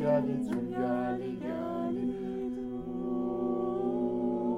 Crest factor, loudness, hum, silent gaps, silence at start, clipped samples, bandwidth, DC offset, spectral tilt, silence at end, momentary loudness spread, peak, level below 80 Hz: 16 dB; -33 LUFS; none; none; 0 s; under 0.1%; 10 kHz; under 0.1%; -9 dB/octave; 0 s; 5 LU; -16 dBFS; -58 dBFS